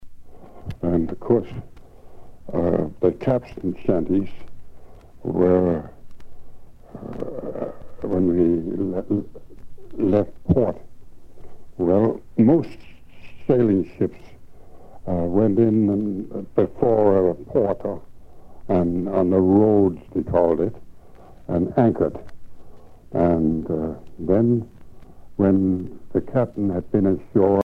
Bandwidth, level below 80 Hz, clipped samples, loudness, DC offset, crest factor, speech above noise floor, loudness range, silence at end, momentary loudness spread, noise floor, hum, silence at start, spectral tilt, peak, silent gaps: 5.8 kHz; -44 dBFS; under 0.1%; -21 LUFS; under 0.1%; 18 dB; 23 dB; 5 LU; 0 s; 16 LU; -42 dBFS; none; 0 s; -11 dB/octave; -4 dBFS; none